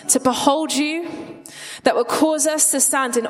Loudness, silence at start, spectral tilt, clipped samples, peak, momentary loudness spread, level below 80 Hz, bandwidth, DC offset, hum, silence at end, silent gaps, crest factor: -18 LUFS; 0 s; -1.5 dB/octave; under 0.1%; -2 dBFS; 18 LU; -62 dBFS; 16 kHz; under 0.1%; none; 0 s; none; 18 dB